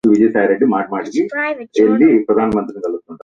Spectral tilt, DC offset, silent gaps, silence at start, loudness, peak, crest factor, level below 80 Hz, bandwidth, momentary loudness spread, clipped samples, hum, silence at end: -7.5 dB/octave; under 0.1%; none; 0.05 s; -15 LUFS; 0 dBFS; 14 dB; -50 dBFS; 7.4 kHz; 9 LU; under 0.1%; none; 0.05 s